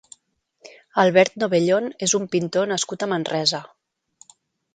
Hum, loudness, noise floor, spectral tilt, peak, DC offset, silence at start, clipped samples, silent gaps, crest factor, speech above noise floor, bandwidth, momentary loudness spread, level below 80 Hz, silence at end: none; -21 LUFS; -67 dBFS; -3.5 dB/octave; 0 dBFS; under 0.1%; 0.65 s; under 0.1%; none; 22 dB; 46 dB; 9.6 kHz; 7 LU; -68 dBFS; 1.1 s